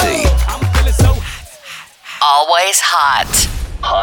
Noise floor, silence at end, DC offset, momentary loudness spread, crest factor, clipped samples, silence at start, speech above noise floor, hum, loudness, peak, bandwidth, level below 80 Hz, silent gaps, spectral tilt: -34 dBFS; 0 s; under 0.1%; 20 LU; 14 dB; under 0.1%; 0 s; 21 dB; none; -13 LUFS; 0 dBFS; 19.5 kHz; -18 dBFS; none; -3 dB/octave